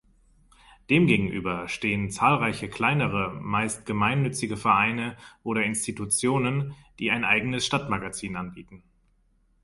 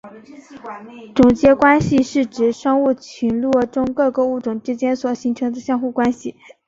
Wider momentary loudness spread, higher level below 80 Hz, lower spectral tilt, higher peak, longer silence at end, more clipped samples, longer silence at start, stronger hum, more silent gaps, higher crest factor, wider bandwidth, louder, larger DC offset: second, 10 LU vs 17 LU; second, -54 dBFS vs -48 dBFS; second, -4.5 dB/octave vs -6.5 dB/octave; second, -6 dBFS vs -2 dBFS; first, 0.85 s vs 0.35 s; neither; first, 0.9 s vs 0.05 s; neither; neither; about the same, 20 dB vs 16 dB; first, 12 kHz vs 7.8 kHz; second, -25 LUFS vs -17 LUFS; neither